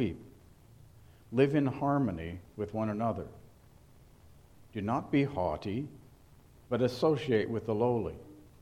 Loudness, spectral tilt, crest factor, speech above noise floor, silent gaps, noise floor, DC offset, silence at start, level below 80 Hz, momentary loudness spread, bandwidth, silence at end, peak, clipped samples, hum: -32 LUFS; -8 dB/octave; 20 dB; 27 dB; none; -58 dBFS; under 0.1%; 0 s; -58 dBFS; 14 LU; 14.5 kHz; 0.2 s; -12 dBFS; under 0.1%; none